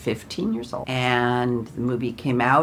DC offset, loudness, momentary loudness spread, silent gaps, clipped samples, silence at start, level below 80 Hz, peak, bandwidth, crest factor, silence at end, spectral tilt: under 0.1%; -24 LUFS; 7 LU; none; under 0.1%; 0 s; -52 dBFS; -4 dBFS; 15 kHz; 18 dB; 0 s; -6 dB/octave